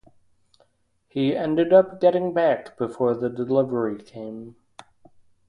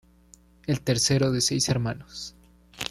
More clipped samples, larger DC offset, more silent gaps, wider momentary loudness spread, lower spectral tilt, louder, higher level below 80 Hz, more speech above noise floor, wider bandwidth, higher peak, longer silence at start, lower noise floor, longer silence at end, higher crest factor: neither; neither; neither; first, 19 LU vs 16 LU; first, -8 dB/octave vs -4 dB/octave; first, -22 LUFS vs -25 LUFS; second, -64 dBFS vs -52 dBFS; first, 44 dB vs 31 dB; second, 9.6 kHz vs 14.5 kHz; first, -4 dBFS vs -8 dBFS; first, 1.15 s vs 0.7 s; first, -66 dBFS vs -56 dBFS; first, 1 s vs 0 s; about the same, 20 dB vs 20 dB